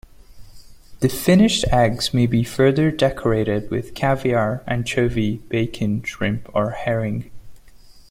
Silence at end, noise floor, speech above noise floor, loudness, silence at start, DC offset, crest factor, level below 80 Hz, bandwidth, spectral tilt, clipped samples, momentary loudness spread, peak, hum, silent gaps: 0.1 s; -44 dBFS; 25 dB; -20 LUFS; 0.3 s; under 0.1%; 18 dB; -38 dBFS; 16.5 kHz; -6 dB/octave; under 0.1%; 8 LU; -2 dBFS; none; none